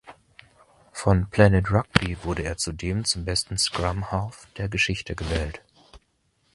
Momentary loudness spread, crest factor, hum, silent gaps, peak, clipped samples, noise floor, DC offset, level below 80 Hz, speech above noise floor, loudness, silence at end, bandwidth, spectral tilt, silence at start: 12 LU; 24 dB; none; none; 0 dBFS; under 0.1%; -69 dBFS; under 0.1%; -38 dBFS; 45 dB; -24 LUFS; 0.55 s; 11.5 kHz; -4.5 dB/octave; 0.05 s